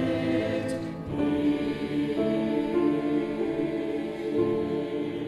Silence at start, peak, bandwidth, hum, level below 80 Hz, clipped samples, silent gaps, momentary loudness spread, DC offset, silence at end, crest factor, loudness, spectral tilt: 0 s; -14 dBFS; 12 kHz; none; -56 dBFS; under 0.1%; none; 6 LU; under 0.1%; 0 s; 14 dB; -28 LUFS; -7.5 dB/octave